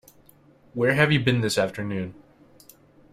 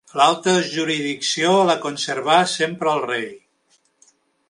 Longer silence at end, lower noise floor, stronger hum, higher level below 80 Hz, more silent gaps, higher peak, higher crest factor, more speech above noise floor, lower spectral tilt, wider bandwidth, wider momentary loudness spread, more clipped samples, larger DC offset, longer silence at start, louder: about the same, 1 s vs 1.1 s; second, -56 dBFS vs -63 dBFS; neither; first, -58 dBFS vs -72 dBFS; neither; about the same, -2 dBFS vs 0 dBFS; about the same, 24 dB vs 20 dB; second, 33 dB vs 44 dB; first, -5.5 dB/octave vs -3.5 dB/octave; first, 16 kHz vs 11.5 kHz; first, 15 LU vs 8 LU; neither; neither; first, 0.75 s vs 0.15 s; second, -23 LUFS vs -19 LUFS